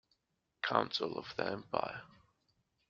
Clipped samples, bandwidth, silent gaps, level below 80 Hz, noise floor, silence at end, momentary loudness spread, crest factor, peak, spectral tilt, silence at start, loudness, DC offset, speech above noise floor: under 0.1%; 7.6 kHz; none; -74 dBFS; -83 dBFS; 0.8 s; 9 LU; 28 dB; -12 dBFS; -2 dB/octave; 0.65 s; -37 LUFS; under 0.1%; 45 dB